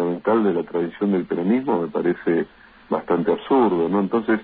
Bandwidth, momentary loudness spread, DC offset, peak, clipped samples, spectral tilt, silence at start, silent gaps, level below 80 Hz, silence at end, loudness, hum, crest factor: 4.7 kHz; 6 LU; under 0.1%; -8 dBFS; under 0.1%; -11.5 dB/octave; 0 s; none; -60 dBFS; 0 s; -21 LUFS; none; 14 dB